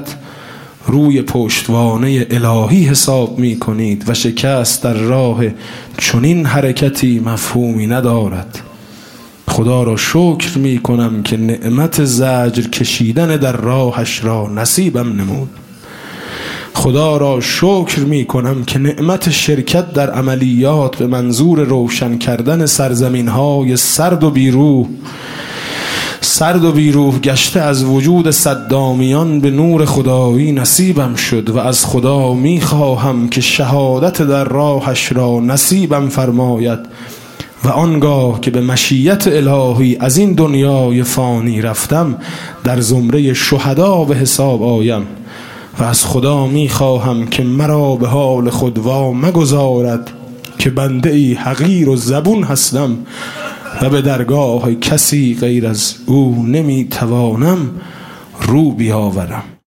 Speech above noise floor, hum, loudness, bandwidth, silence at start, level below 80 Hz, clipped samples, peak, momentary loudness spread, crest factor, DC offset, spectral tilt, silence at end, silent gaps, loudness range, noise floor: 24 dB; none; -12 LUFS; 17 kHz; 0 s; -44 dBFS; under 0.1%; 0 dBFS; 10 LU; 12 dB; 0.2%; -5 dB/octave; 0.1 s; none; 3 LU; -36 dBFS